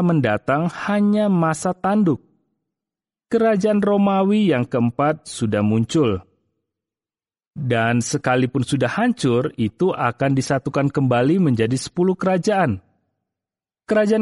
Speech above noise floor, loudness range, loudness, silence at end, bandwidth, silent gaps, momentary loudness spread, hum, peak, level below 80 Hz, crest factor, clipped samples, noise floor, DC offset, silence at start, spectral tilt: over 72 dB; 3 LU; -19 LUFS; 0 s; 11.5 kHz; 7.47-7.51 s; 5 LU; none; -4 dBFS; -56 dBFS; 16 dB; under 0.1%; under -90 dBFS; under 0.1%; 0 s; -6.5 dB/octave